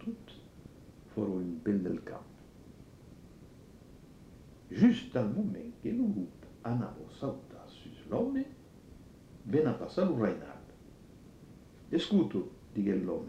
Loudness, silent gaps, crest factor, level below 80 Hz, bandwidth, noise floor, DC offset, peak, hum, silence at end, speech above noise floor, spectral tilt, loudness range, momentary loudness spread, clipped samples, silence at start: -33 LUFS; none; 22 dB; -62 dBFS; 9.4 kHz; -55 dBFS; under 0.1%; -14 dBFS; none; 0 s; 23 dB; -8 dB/octave; 6 LU; 25 LU; under 0.1%; 0 s